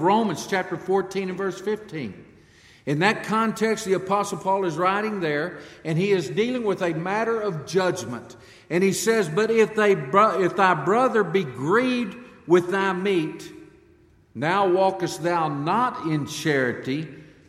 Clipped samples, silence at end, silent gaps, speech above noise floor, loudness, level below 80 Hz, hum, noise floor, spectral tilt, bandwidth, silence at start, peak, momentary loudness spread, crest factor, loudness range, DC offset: under 0.1%; 0.25 s; none; 33 dB; -23 LUFS; -64 dBFS; none; -56 dBFS; -5.5 dB/octave; 15.5 kHz; 0 s; -4 dBFS; 11 LU; 20 dB; 5 LU; under 0.1%